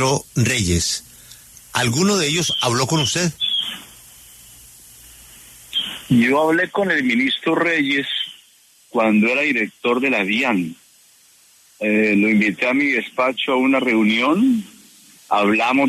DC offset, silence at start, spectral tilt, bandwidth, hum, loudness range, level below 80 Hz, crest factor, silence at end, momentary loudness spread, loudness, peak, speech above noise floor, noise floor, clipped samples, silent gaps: under 0.1%; 0 s; -4 dB/octave; 13.5 kHz; none; 4 LU; -48 dBFS; 16 dB; 0 s; 8 LU; -18 LUFS; -4 dBFS; 35 dB; -53 dBFS; under 0.1%; none